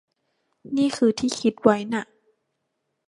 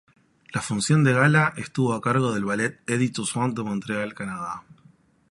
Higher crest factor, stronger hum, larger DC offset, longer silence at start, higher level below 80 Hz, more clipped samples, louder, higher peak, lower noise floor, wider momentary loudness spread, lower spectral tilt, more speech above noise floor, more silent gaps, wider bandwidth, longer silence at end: about the same, 22 dB vs 18 dB; neither; neither; first, 0.65 s vs 0.5 s; about the same, -64 dBFS vs -60 dBFS; neither; about the same, -23 LUFS vs -24 LUFS; first, -2 dBFS vs -6 dBFS; first, -77 dBFS vs -57 dBFS; second, 9 LU vs 13 LU; about the same, -5 dB/octave vs -5.5 dB/octave; first, 55 dB vs 34 dB; neither; about the same, 11.5 kHz vs 11.5 kHz; first, 1.05 s vs 0.6 s